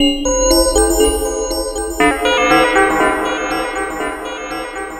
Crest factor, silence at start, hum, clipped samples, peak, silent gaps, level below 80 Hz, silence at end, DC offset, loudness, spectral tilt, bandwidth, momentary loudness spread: 14 dB; 0 s; none; under 0.1%; 0 dBFS; none; -28 dBFS; 0 s; under 0.1%; -15 LUFS; -2.5 dB/octave; 16 kHz; 12 LU